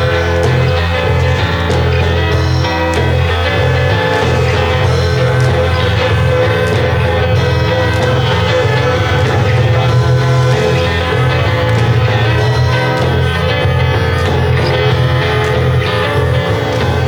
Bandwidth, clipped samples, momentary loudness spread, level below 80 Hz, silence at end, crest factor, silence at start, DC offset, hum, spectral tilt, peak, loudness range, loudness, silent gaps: 13.5 kHz; under 0.1%; 2 LU; -26 dBFS; 0 s; 10 dB; 0 s; under 0.1%; none; -6 dB/octave; -2 dBFS; 1 LU; -12 LUFS; none